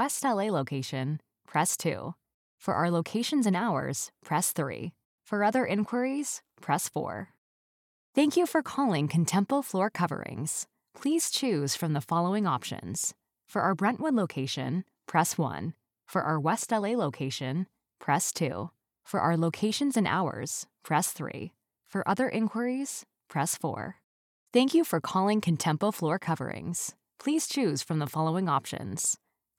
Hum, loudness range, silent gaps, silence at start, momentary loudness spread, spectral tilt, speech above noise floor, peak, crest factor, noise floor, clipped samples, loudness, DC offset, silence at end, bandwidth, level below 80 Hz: none; 2 LU; 2.34-2.58 s, 5.05-5.18 s, 7.38-8.13 s, 24.04-24.46 s; 0 s; 10 LU; -4.5 dB/octave; over 61 dB; -10 dBFS; 20 dB; under -90 dBFS; under 0.1%; -29 LUFS; under 0.1%; 0.45 s; 18 kHz; -72 dBFS